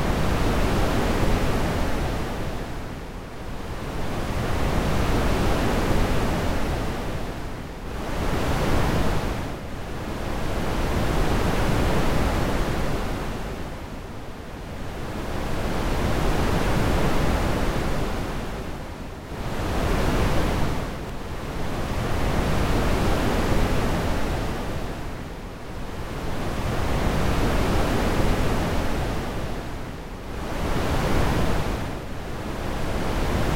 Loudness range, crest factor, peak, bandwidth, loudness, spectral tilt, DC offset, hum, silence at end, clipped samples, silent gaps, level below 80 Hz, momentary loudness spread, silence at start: 4 LU; 14 dB; -8 dBFS; 16 kHz; -26 LUFS; -6 dB/octave; under 0.1%; none; 0 s; under 0.1%; none; -28 dBFS; 11 LU; 0 s